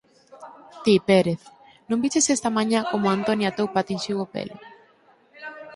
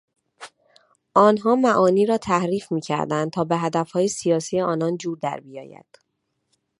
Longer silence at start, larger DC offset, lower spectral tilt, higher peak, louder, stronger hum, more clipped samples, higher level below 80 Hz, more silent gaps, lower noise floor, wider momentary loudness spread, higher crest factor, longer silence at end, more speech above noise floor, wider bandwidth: about the same, 0.35 s vs 0.4 s; neither; second, -4.5 dB/octave vs -6 dB/octave; about the same, -4 dBFS vs -2 dBFS; about the same, -23 LUFS vs -21 LUFS; neither; neither; about the same, -64 dBFS vs -64 dBFS; neither; second, -58 dBFS vs -75 dBFS; first, 18 LU vs 11 LU; about the same, 20 dB vs 20 dB; second, 0 s vs 1.1 s; second, 36 dB vs 54 dB; about the same, 11.5 kHz vs 11.5 kHz